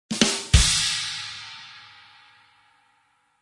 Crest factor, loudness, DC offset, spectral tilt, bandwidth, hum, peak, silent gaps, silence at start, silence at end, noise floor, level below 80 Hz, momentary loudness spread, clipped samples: 26 dB; -21 LUFS; under 0.1%; -2.5 dB/octave; 11.5 kHz; none; 0 dBFS; none; 0.1 s; 1.6 s; -66 dBFS; -32 dBFS; 23 LU; under 0.1%